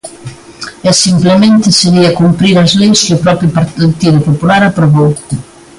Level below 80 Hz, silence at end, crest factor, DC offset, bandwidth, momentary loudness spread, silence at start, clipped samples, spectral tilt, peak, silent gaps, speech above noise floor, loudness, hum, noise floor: -40 dBFS; 0.35 s; 8 dB; under 0.1%; 11.5 kHz; 14 LU; 0.05 s; under 0.1%; -5 dB/octave; 0 dBFS; none; 21 dB; -8 LUFS; none; -28 dBFS